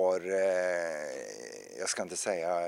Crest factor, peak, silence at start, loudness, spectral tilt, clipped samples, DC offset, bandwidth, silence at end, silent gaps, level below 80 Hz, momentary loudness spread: 16 dB; -16 dBFS; 0 s; -32 LUFS; -2.5 dB/octave; under 0.1%; under 0.1%; 15.5 kHz; 0 s; none; -80 dBFS; 13 LU